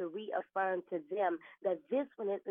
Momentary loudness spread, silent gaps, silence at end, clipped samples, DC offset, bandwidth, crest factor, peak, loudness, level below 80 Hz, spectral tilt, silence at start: 4 LU; none; 0 s; under 0.1%; under 0.1%; 3.7 kHz; 16 dB; -22 dBFS; -37 LUFS; under -90 dBFS; -4 dB/octave; 0 s